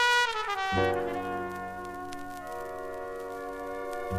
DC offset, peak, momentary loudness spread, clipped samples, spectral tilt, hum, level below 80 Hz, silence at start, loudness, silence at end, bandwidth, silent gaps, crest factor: under 0.1%; -12 dBFS; 12 LU; under 0.1%; -3.5 dB/octave; none; -54 dBFS; 0 s; -32 LUFS; 0 s; 15.5 kHz; none; 20 dB